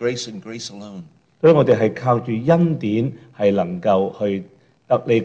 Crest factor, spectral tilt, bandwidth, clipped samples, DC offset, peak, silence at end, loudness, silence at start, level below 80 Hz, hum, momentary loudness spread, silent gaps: 16 dB; -7 dB/octave; 8.6 kHz; under 0.1%; under 0.1%; -2 dBFS; 0 s; -19 LUFS; 0 s; -60 dBFS; none; 16 LU; none